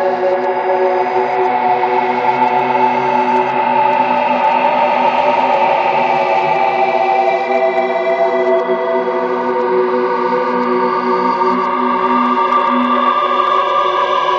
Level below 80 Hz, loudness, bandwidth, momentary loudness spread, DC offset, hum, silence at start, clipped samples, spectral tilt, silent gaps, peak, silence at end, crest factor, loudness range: -62 dBFS; -14 LUFS; 7.4 kHz; 3 LU; under 0.1%; none; 0 s; under 0.1%; -5.5 dB/octave; none; -2 dBFS; 0 s; 12 dB; 2 LU